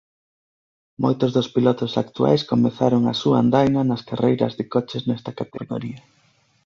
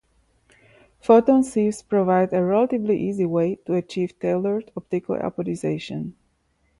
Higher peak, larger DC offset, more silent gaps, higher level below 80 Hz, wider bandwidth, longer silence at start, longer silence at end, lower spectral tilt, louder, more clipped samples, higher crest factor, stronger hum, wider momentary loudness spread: about the same, -4 dBFS vs -4 dBFS; neither; neither; about the same, -58 dBFS vs -60 dBFS; second, 7.2 kHz vs 11.5 kHz; about the same, 1 s vs 1.05 s; about the same, 0.65 s vs 0.7 s; about the same, -7.5 dB/octave vs -7.5 dB/octave; about the same, -21 LUFS vs -22 LUFS; neither; about the same, 18 dB vs 20 dB; neither; about the same, 12 LU vs 12 LU